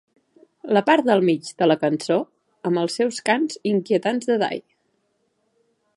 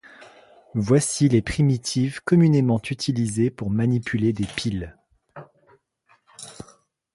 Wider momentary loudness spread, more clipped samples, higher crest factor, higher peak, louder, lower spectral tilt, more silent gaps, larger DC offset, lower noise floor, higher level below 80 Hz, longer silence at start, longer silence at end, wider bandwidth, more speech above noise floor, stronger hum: second, 9 LU vs 21 LU; neither; about the same, 20 dB vs 18 dB; first, -2 dBFS vs -6 dBFS; about the same, -21 LUFS vs -22 LUFS; about the same, -5.5 dB/octave vs -6 dB/octave; neither; neither; first, -69 dBFS vs -63 dBFS; second, -76 dBFS vs -48 dBFS; first, 0.65 s vs 0.2 s; first, 1.35 s vs 0.5 s; about the same, 11.5 kHz vs 11.5 kHz; first, 49 dB vs 42 dB; neither